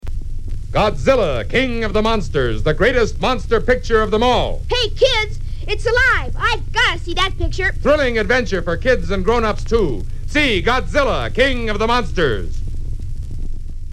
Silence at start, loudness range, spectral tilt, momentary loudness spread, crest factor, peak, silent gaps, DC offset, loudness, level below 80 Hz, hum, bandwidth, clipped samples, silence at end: 0.05 s; 1 LU; -5 dB/octave; 14 LU; 16 dB; 0 dBFS; none; under 0.1%; -17 LUFS; -22 dBFS; none; 10.5 kHz; under 0.1%; 0 s